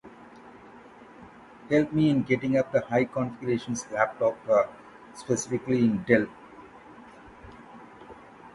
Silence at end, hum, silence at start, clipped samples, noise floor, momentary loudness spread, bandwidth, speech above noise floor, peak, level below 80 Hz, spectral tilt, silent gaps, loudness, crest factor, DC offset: 0.05 s; none; 0.05 s; under 0.1%; -49 dBFS; 24 LU; 11.5 kHz; 24 dB; -6 dBFS; -60 dBFS; -6 dB/octave; none; -26 LUFS; 22 dB; under 0.1%